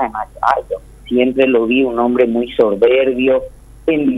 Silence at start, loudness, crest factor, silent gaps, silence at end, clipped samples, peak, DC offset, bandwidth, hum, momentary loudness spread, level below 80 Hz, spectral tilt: 0 s; -15 LUFS; 14 dB; none; 0 s; under 0.1%; 0 dBFS; under 0.1%; 11.5 kHz; none; 9 LU; -42 dBFS; -6.5 dB/octave